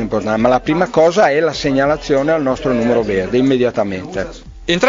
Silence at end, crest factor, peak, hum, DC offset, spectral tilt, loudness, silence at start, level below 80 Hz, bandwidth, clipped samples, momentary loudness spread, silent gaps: 0 s; 14 dB; 0 dBFS; none; under 0.1%; -5.5 dB/octave; -15 LUFS; 0 s; -38 dBFS; 7.6 kHz; under 0.1%; 9 LU; none